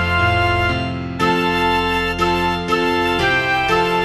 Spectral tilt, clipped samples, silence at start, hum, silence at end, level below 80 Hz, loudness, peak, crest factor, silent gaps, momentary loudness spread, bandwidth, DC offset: -5 dB/octave; under 0.1%; 0 s; none; 0 s; -34 dBFS; -17 LUFS; -4 dBFS; 14 dB; none; 3 LU; 15 kHz; under 0.1%